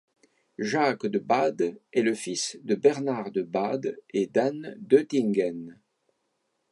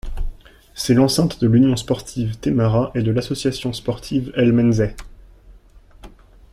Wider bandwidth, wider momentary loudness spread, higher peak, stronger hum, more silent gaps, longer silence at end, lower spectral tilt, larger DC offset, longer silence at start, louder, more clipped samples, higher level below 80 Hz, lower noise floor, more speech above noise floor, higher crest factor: second, 11.5 kHz vs 15 kHz; second, 8 LU vs 11 LU; about the same, -6 dBFS vs -4 dBFS; neither; neither; first, 1 s vs 0.45 s; second, -5 dB/octave vs -6.5 dB/octave; neither; first, 0.6 s vs 0.05 s; second, -26 LUFS vs -19 LUFS; neither; second, -78 dBFS vs -34 dBFS; first, -76 dBFS vs -46 dBFS; first, 50 dB vs 29 dB; about the same, 20 dB vs 16 dB